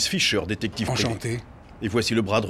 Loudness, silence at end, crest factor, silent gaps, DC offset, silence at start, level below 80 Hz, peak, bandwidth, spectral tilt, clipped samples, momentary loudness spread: -25 LUFS; 0 s; 18 dB; none; under 0.1%; 0 s; -48 dBFS; -8 dBFS; 15.5 kHz; -4 dB/octave; under 0.1%; 10 LU